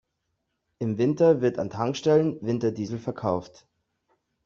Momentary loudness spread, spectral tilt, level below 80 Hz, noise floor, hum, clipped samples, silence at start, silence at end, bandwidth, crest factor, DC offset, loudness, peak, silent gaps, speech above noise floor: 11 LU; -7 dB/octave; -64 dBFS; -78 dBFS; none; under 0.1%; 0.8 s; 1 s; 7.4 kHz; 18 dB; under 0.1%; -25 LUFS; -8 dBFS; none; 54 dB